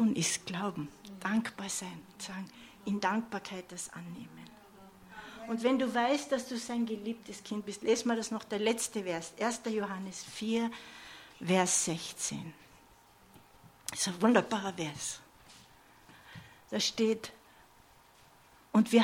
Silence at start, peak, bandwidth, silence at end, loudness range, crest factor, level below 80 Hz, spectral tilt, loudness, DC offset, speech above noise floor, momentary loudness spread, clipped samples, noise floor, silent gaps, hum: 0 s; -10 dBFS; 16.5 kHz; 0 s; 5 LU; 24 dB; -72 dBFS; -3.5 dB/octave; -33 LUFS; under 0.1%; 28 dB; 19 LU; under 0.1%; -61 dBFS; none; none